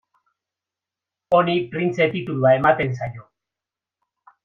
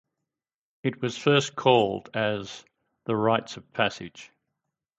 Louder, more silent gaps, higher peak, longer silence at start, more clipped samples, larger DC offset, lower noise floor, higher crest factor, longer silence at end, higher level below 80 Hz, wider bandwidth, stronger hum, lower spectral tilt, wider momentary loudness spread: first, -20 LUFS vs -26 LUFS; neither; first, -2 dBFS vs -6 dBFS; first, 1.3 s vs 0.85 s; neither; neither; about the same, -88 dBFS vs under -90 dBFS; about the same, 20 dB vs 22 dB; first, 1.25 s vs 0.75 s; first, -58 dBFS vs -66 dBFS; second, 7.2 kHz vs 8.2 kHz; neither; first, -7.5 dB/octave vs -5 dB/octave; second, 9 LU vs 18 LU